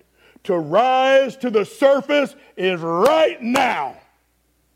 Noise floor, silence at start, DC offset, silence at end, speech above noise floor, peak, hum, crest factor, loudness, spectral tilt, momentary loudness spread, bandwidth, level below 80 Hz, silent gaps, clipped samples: -64 dBFS; 0.45 s; under 0.1%; 0.85 s; 46 dB; -4 dBFS; none; 16 dB; -18 LUFS; -4.5 dB/octave; 9 LU; 16 kHz; -64 dBFS; none; under 0.1%